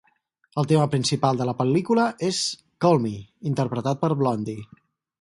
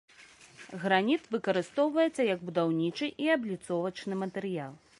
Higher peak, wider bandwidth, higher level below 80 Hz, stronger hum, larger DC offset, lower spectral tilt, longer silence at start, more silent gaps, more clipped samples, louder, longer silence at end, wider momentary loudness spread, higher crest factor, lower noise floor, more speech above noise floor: first, -6 dBFS vs -12 dBFS; about the same, 11.5 kHz vs 11.5 kHz; first, -62 dBFS vs -76 dBFS; neither; neither; about the same, -6 dB/octave vs -6 dB/octave; first, 0.55 s vs 0.2 s; neither; neither; first, -23 LUFS vs -30 LUFS; first, 0.6 s vs 0.25 s; about the same, 10 LU vs 9 LU; about the same, 18 dB vs 20 dB; first, -65 dBFS vs -56 dBFS; first, 43 dB vs 26 dB